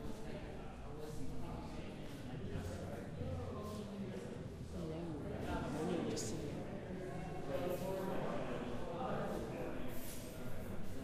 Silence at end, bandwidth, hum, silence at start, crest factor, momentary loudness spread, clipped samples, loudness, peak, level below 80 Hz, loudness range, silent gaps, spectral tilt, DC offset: 0 s; 15.5 kHz; none; 0 s; 16 dB; 8 LU; under 0.1%; -45 LUFS; -28 dBFS; -54 dBFS; 4 LU; none; -6 dB/octave; under 0.1%